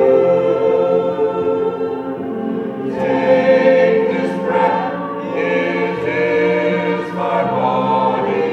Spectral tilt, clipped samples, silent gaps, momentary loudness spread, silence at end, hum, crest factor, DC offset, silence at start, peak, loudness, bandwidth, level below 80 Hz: -7.5 dB/octave; under 0.1%; none; 10 LU; 0 s; none; 14 dB; under 0.1%; 0 s; -2 dBFS; -16 LUFS; 7 kHz; -56 dBFS